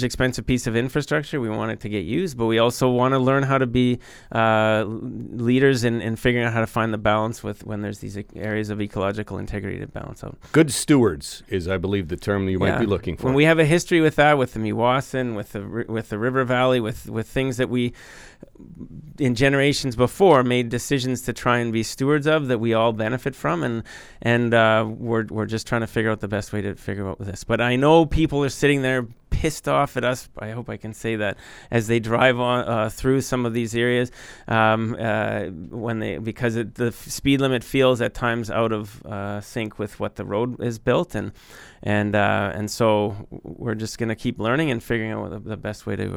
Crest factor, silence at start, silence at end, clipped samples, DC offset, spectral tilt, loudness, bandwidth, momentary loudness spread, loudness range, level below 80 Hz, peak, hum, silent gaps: 18 dB; 0 s; 0 s; under 0.1%; under 0.1%; -5.5 dB/octave; -22 LUFS; 18.5 kHz; 13 LU; 5 LU; -42 dBFS; -4 dBFS; none; none